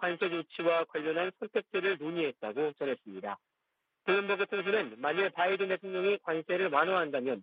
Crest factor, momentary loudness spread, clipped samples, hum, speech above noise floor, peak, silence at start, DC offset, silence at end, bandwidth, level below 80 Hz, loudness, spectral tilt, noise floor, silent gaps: 20 dB; 7 LU; under 0.1%; none; 51 dB; -12 dBFS; 0 s; under 0.1%; 0 s; 5 kHz; -82 dBFS; -32 LUFS; -8 dB/octave; -83 dBFS; none